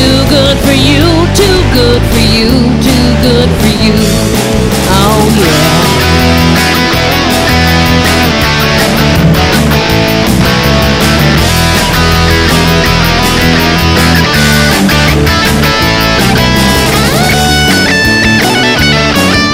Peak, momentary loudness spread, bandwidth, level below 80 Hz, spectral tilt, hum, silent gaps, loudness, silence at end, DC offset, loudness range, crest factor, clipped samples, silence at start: 0 dBFS; 2 LU; 16.5 kHz; -18 dBFS; -4.5 dB/octave; none; none; -7 LUFS; 0 s; under 0.1%; 1 LU; 6 dB; 1%; 0 s